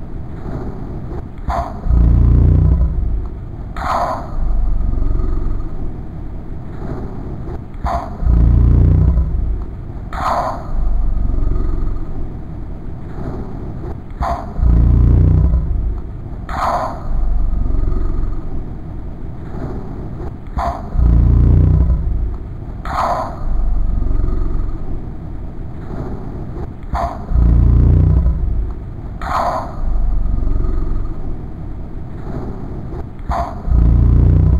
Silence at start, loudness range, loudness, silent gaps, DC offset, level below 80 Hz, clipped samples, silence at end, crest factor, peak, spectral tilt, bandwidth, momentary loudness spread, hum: 0 s; 8 LU; -19 LUFS; none; under 0.1%; -16 dBFS; under 0.1%; 0 s; 14 dB; -2 dBFS; -9 dB/octave; 7 kHz; 17 LU; none